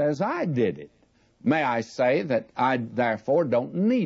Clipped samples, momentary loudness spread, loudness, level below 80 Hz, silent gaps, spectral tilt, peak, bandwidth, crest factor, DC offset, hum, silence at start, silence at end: under 0.1%; 5 LU; -25 LUFS; -68 dBFS; none; -7.5 dB/octave; -10 dBFS; 7.8 kHz; 14 dB; under 0.1%; none; 0 s; 0 s